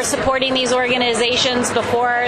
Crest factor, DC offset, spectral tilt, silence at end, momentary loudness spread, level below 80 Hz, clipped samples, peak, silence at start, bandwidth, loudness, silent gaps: 14 dB; under 0.1%; -2.5 dB/octave; 0 s; 2 LU; -44 dBFS; under 0.1%; -4 dBFS; 0 s; 12.5 kHz; -16 LUFS; none